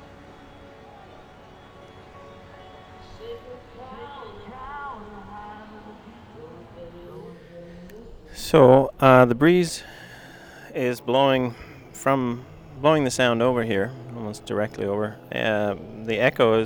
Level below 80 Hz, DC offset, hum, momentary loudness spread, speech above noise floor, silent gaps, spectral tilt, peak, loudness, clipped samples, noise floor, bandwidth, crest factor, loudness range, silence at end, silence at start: -52 dBFS; under 0.1%; none; 27 LU; 27 dB; none; -6 dB/octave; -2 dBFS; -21 LUFS; under 0.1%; -47 dBFS; over 20 kHz; 22 dB; 23 LU; 0 s; 2.15 s